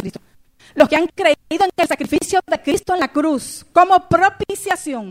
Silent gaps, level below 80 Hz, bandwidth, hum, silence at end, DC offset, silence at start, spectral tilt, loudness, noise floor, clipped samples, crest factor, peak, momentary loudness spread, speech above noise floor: none; -48 dBFS; 16 kHz; none; 0 s; under 0.1%; 0 s; -4 dB/octave; -17 LUFS; -50 dBFS; under 0.1%; 18 dB; 0 dBFS; 9 LU; 34 dB